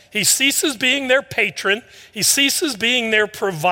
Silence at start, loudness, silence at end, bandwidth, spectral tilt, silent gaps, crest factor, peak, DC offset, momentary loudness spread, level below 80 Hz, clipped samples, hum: 0.15 s; -16 LUFS; 0 s; 17 kHz; -1 dB/octave; none; 16 dB; -2 dBFS; under 0.1%; 7 LU; -62 dBFS; under 0.1%; none